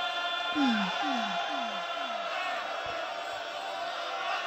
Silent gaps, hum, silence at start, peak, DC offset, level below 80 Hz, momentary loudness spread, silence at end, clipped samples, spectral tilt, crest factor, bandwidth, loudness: none; none; 0 s; -16 dBFS; under 0.1%; -72 dBFS; 8 LU; 0 s; under 0.1%; -3.5 dB/octave; 16 dB; 16 kHz; -32 LUFS